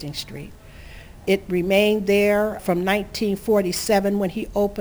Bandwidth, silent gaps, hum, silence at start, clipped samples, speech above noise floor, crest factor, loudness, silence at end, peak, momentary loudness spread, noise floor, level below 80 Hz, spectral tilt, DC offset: over 20 kHz; none; none; 0 s; under 0.1%; 20 dB; 16 dB; -21 LUFS; 0 s; -6 dBFS; 13 LU; -41 dBFS; -44 dBFS; -5 dB/octave; 0.1%